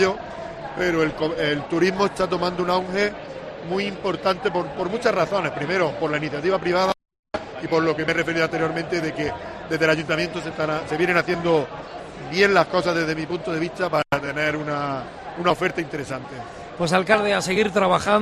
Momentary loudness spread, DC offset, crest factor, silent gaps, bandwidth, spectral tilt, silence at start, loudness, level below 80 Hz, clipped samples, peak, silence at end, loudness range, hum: 13 LU; under 0.1%; 20 dB; 7.19-7.23 s; 13 kHz; -5 dB/octave; 0 s; -22 LUFS; -50 dBFS; under 0.1%; -2 dBFS; 0 s; 2 LU; none